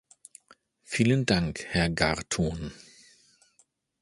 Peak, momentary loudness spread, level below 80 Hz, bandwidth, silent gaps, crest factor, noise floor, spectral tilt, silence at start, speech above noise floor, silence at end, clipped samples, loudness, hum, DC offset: -6 dBFS; 14 LU; -46 dBFS; 11.5 kHz; none; 24 dB; -68 dBFS; -5 dB/octave; 0.9 s; 41 dB; 1.25 s; under 0.1%; -27 LUFS; none; under 0.1%